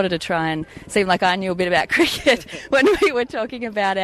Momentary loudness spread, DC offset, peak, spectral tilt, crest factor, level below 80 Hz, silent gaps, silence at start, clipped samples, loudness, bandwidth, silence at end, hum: 8 LU; under 0.1%; -4 dBFS; -4 dB/octave; 16 dB; -48 dBFS; none; 0 s; under 0.1%; -19 LUFS; 14 kHz; 0 s; none